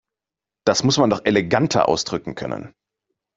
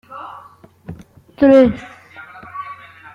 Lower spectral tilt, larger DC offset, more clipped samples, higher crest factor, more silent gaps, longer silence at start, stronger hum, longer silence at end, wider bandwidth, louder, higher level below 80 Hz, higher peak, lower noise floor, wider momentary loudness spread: second, -4.5 dB/octave vs -8 dB/octave; neither; neither; about the same, 18 dB vs 18 dB; neither; first, 0.65 s vs 0.15 s; neither; first, 0.7 s vs 0.4 s; first, 8 kHz vs 7 kHz; second, -20 LUFS vs -12 LUFS; about the same, -54 dBFS vs -50 dBFS; about the same, -2 dBFS vs -2 dBFS; first, -88 dBFS vs -44 dBFS; second, 12 LU vs 27 LU